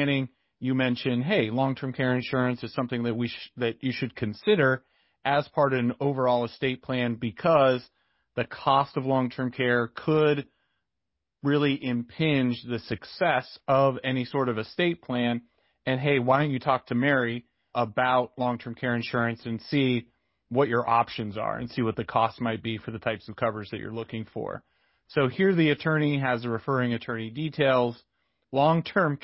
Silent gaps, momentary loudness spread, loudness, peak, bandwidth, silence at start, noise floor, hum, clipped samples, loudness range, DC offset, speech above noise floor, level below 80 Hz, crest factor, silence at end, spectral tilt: none; 10 LU; -27 LUFS; -6 dBFS; 5.8 kHz; 0 s; -85 dBFS; none; under 0.1%; 2 LU; under 0.1%; 59 dB; -62 dBFS; 20 dB; 0.1 s; -10.5 dB/octave